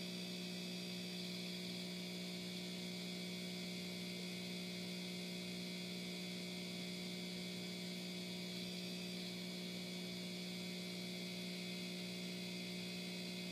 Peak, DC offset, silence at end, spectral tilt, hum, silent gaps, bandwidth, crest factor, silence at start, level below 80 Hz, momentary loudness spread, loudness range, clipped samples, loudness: -34 dBFS; under 0.1%; 0 s; -4 dB/octave; 60 Hz at -50 dBFS; none; 15.5 kHz; 12 dB; 0 s; -84 dBFS; 1 LU; 0 LU; under 0.1%; -46 LUFS